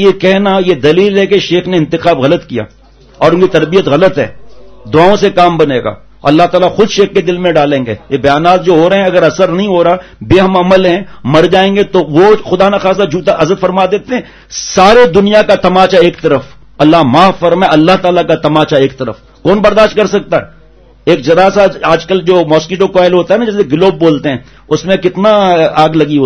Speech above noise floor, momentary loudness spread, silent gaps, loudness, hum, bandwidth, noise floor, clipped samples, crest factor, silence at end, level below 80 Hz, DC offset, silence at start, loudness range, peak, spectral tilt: 32 dB; 8 LU; none; -8 LUFS; none; 10 kHz; -40 dBFS; 2%; 8 dB; 0 s; -38 dBFS; under 0.1%; 0 s; 2 LU; 0 dBFS; -6 dB/octave